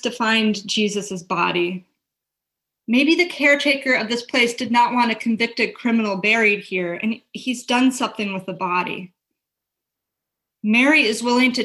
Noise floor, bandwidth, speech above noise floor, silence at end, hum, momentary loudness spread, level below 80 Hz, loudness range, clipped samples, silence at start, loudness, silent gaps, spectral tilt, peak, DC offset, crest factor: -83 dBFS; 12.5 kHz; 64 dB; 0 s; none; 11 LU; -68 dBFS; 6 LU; under 0.1%; 0.05 s; -19 LUFS; none; -3.5 dB/octave; -4 dBFS; under 0.1%; 16 dB